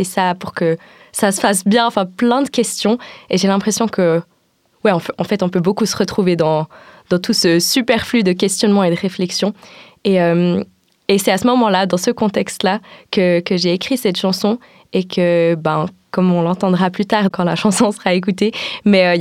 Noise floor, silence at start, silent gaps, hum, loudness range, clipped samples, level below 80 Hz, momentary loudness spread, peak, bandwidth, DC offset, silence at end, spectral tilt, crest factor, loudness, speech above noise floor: -59 dBFS; 0 s; none; none; 2 LU; under 0.1%; -56 dBFS; 7 LU; 0 dBFS; 15.5 kHz; under 0.1%; 0 s; -5 dB/octave; 16 dB; -16 LUFS; 44 dB